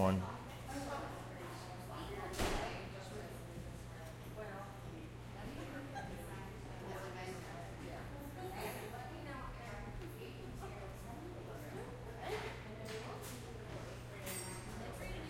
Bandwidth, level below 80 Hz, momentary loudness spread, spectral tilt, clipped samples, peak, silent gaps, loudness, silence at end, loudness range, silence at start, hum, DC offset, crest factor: 16.5 kHz; -56 dBFS; 6 LU; -5 dB/octave; under 0.1%; -22 dBFS; none; -47 LUFS; 0 s; 4 LU; 0 s; none; under 0.1%; 24 dB